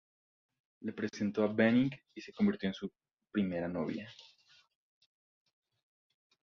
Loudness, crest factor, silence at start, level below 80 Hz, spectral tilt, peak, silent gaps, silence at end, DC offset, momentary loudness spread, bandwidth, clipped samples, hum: -34 LUFS; 22 dB; 0.8 s; -70 dBFS; -7 dB/octave; -16 dBFS; 3.13-3.17 s; 2.25 s; under 0.1%; 17 LU; 6.8 kHz; under 0.1%; none